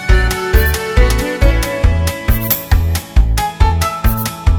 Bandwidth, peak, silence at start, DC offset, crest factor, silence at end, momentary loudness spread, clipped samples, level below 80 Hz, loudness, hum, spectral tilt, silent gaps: over 20 kHz; 0 dBFS; 0 s; under 0.1%; 12 dB; 0 s; 3 LU; under 0.1%; -14 dBFS; -15 LUFS; none; -5 dB/octave; none